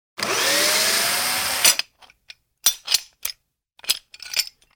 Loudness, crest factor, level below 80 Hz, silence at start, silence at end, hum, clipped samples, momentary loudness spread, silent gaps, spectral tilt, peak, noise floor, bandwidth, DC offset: -19 LUFS; 22 dB; -60 dBFS; 0.2 s; 0.25 s; none; under 0.1%; 14 LU; none; 1 dB/octave; -2 dBFS; -59 dBFS; over 20 kHz; under 0.1%